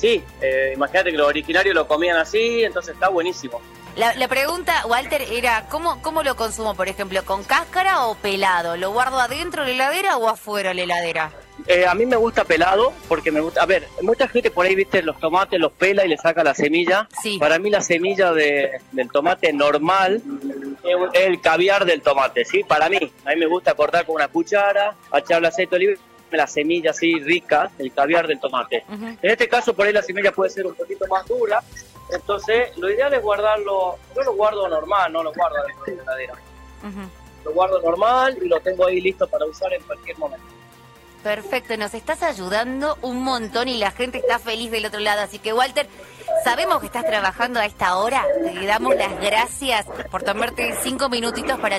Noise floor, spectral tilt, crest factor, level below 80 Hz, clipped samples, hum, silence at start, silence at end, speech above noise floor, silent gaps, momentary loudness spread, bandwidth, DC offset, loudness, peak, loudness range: -46 dBFS; -3.5 dB/octave; 16 dB; -48 dBFS; under 0.1%; none; 0 s; 0 s; 27 dB; none; 9 LU; 16 kHz; under 0.1%; -20 LUFS; -4 dBFS; 5 LU